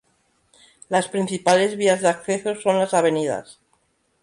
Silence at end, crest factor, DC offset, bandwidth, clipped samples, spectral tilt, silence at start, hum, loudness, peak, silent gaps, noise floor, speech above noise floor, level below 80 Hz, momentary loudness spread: 0.7 s; 18 dB; under 0.1%; 11.5 kHz; under 0.1%; -4 dB/octave; 0.9 s; none; -21 LUFS; -4 dBFS; none; -66 dBFS; 46 dB; -66 dBFS; 7 LU